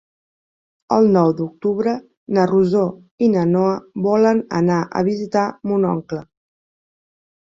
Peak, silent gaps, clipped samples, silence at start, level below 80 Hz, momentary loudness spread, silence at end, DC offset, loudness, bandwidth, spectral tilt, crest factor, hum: -2 dBFS; 2.17-2.26 s, 3.11-3.18 s; under 0.1%; 0.9 s; -58 dBFS; 7 LU; 1.35 s; under 0.1%; -18 LUFS; 7.6 kHz; -8 dB/octave; 16 dB; none